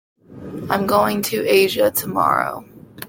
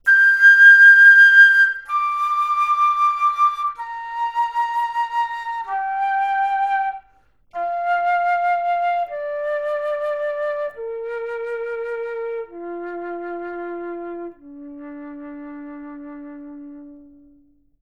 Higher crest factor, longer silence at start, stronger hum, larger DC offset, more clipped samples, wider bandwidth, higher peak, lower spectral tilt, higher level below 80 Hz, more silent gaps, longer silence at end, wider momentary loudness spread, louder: about the same, 18 dB vs 16 dB; first, 0.3 s vs 0.05 s; neither; second, under 0.1% vs 0.1%; neither; first, 17 kHz vs 12.5 kHz; about the same, -2 dBFS vs -2 dBFS; first, -4 dB/octave vs -1.5 dB/octave; first, -56 dBFS vs -62 dBFS; neither; second, 0 s vs 0.85 s; second, 18 LU vs 27 LU; second, -18 LUFS vs -15 LUFS